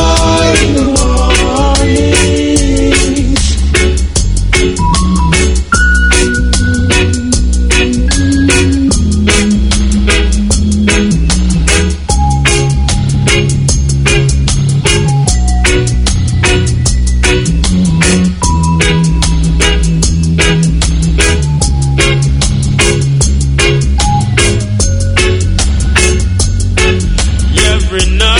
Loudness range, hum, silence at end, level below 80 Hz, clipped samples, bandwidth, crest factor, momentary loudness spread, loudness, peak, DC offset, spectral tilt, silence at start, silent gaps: 1 LU; none; 0 s; -12 dBFS; 0.3%; 11 kHz; 8 dB; 3 LU; -10 LUFS; 0 dBFS; under 0.1%; -4.5 dB/octave; 0 s; none